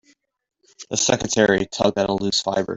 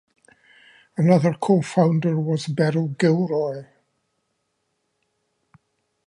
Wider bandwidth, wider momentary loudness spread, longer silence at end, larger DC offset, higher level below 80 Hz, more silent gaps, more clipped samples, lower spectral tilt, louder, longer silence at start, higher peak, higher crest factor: second, 8.2 kHz vs 10.5 kHz; second, 4 LU vs 8 LU; second, 0 s vs 2.45 s; neither; first, -52 dBFS vs -70 dBFS; neither; neither; second, -3 dB/octave vs -7.5 dB/octave; about the same, -20 LUFS vs -21 LUFS; second, 0.8 s vs 1 s; about the same, -2 dBFS vs -4 dBFS; about the same, 20 dB vs 20 dB